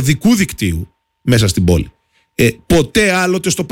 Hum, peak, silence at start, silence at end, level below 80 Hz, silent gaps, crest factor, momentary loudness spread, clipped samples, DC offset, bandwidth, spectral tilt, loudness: none; -2 dBFS; 0 s; 0 s; -30 dBFS; none; 12 dB; 12 LU; under 0.1%; under 0.1%; 17 kHz; -5 dB/octave; -14 LUFS